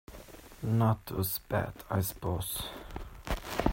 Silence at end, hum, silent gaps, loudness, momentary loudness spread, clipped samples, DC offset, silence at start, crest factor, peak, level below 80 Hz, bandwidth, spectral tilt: 0 s; none; none; -33 LUFS; 16 LU; under 0.1%; under 0.1%; 0.1 s; 22 dB; -10 dBFS; -46 dBFS; 16.5 kHz; -5.5 dB/octave